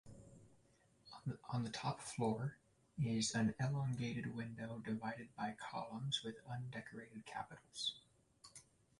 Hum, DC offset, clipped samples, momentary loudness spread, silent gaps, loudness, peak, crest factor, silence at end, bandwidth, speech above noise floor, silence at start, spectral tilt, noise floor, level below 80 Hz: none; under 0.1%; under 0.1%; 21 LU; none; -44 LUFS; -26 dBFS; 18 dB; 0.4 s; 11.5 kHz; 30 dB; 0.05 s; -5 dB/octave; -73 dBFS; -74 dBFS